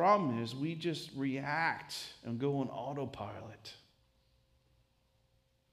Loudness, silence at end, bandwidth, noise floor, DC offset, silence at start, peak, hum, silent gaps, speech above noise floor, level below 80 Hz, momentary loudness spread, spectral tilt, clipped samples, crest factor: -37 LUFS; 1.95 s; 15 kHz; -74 dBFS; under 0.1%; 0 s; -16 dBFS; none; none; 38 dB; -74 dBFS; 14 LU; -6 dB/octave; under 0.1%; 22 dB